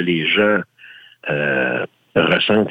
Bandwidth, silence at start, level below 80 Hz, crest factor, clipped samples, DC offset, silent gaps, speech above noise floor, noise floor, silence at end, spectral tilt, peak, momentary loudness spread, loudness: 8.2 kHz; 0 s; -56 dBFS; 14 dB; under 0.1%; under 0.1%; none; 27 dB; -44 dBFS; 0 s; -7.5 dB/octave; -4 dBFS; 10 LU; -17 LUFS